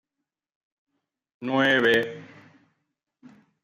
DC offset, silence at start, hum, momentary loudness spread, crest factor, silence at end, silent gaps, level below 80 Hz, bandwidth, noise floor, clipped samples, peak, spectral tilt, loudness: under 0.1%; 1.4 s; none; 18 LU; 20 dB; 1.4 s; none; -72 dBFS; 14 kHz; -86 dBFS; under 0.1%; -8 dBFS; -5 dB/octave; -22 LUFS